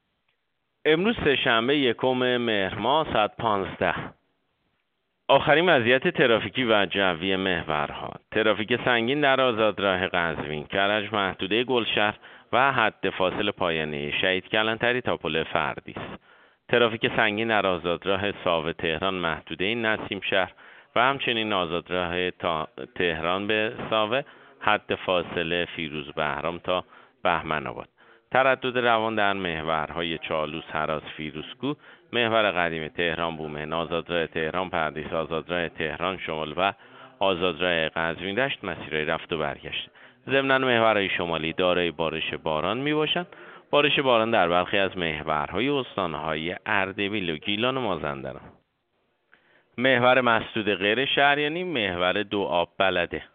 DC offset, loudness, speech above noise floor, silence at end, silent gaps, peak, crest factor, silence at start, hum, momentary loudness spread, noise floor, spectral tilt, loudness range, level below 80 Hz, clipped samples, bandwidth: under 0.1%; -25 LUFS; 52 dB; 0.1 s; none; -4 dBFS; 22 dB; 0.85 s; none; 9 LU; -77 dBFS; -2 dB/octave; 5 LU; -56 dBFS; under 0.1%; 4.7 kHz